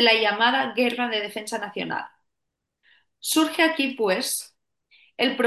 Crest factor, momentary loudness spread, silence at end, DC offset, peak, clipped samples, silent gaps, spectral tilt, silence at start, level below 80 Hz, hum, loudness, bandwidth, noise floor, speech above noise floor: 20 dB; 13 LU; 0 s; under 0.1%; -6 dBFS; under 0.1%; none; -2 dB/octave; 0 s; -76 dBFS; none; -23 LUFS; 13 kHz; -82 dBFS; 59 dB